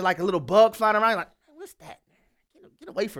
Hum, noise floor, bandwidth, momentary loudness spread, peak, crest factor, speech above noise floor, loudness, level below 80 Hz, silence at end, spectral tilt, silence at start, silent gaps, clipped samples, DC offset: none; -68 dBFS; 16.5 kHz; 22 LU; -6 dBFS; 20 dB; 45 dB; -22 LUFS; -64 dBFS; 0 s; -5 dB/octave; 0 s; none; under 0.1%; under 0.1%